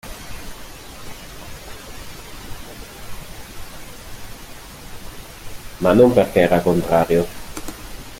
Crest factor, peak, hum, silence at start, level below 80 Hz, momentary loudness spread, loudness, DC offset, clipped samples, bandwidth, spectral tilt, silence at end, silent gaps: 20 dB; -2 dBFS; none; 0.05 s; -40 dBFS; 22 LU; -16 LUFS; under 0.1%; under 0.1%; 17 kHz; -6 dB/octave; 0 s; none